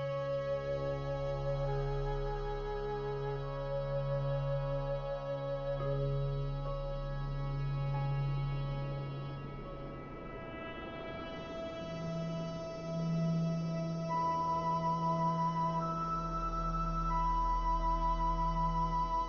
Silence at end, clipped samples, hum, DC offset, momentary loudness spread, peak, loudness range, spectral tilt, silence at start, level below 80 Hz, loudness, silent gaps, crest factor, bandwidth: 0 s; under 0.1%; none; under 0.1%; 10 LU; -22 dBFS; 7 LU; -8 dB/octave; 0 s; -44 dBFS; -36 LUFS; none; 12 dB; 7 kHz